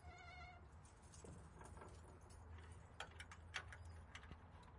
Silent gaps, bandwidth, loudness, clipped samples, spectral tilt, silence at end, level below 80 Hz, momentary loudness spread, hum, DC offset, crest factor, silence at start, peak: none; 11.5 kHz; -58 LUFS; under 0.1%; -4 dB/octave; 0 s; -66 dBFS; 10 LU; none; under 0.1%; 26 dB; 0 s; -32 dBFS